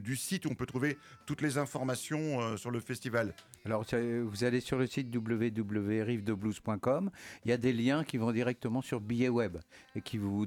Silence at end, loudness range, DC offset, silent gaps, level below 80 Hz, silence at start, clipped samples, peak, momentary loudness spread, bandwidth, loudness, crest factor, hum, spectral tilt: 0 s; 2 LU; under 0.1%; none; -64 dBFS; 0 s; under 0.1%; -16 dBFS; 7 LU; 17.5 kHz; -34 LUFS; 16 dB; none; -6 dB/octave